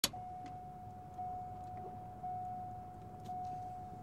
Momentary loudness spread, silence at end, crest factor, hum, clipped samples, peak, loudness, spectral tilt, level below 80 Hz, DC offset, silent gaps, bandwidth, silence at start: 7 LU; 0 s; 30 dB; none; under 0.1%; -16 dBFS; -46 LUFS; -3 dB/octave; -64 dBFS; under 0.1%; none; 16 kHz; 0.05 s